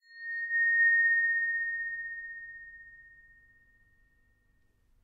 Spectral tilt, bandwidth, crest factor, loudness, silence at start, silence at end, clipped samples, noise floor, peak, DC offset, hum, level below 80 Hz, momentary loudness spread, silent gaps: -2 dB/octave; 4.6 kHz; 14 dB; -27 LUFS; 0.1 s; 2 s; under 0.1%; -69 dBFS; -18 dBFS; under 0.1%; none; -70 dBFS; 22 LU; none